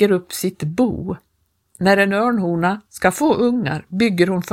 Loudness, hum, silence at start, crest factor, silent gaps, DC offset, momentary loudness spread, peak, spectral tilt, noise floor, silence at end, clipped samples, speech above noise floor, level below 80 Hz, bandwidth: -18 LUFS; none; 0 s; 18 dB; none; under 0.1%; 9 LU; 0 dBFS; -5.5 dB/octave; -54 dBFS; 0 s; under 0.1%; 36 dB; -50 dBFS; 16.5 kHz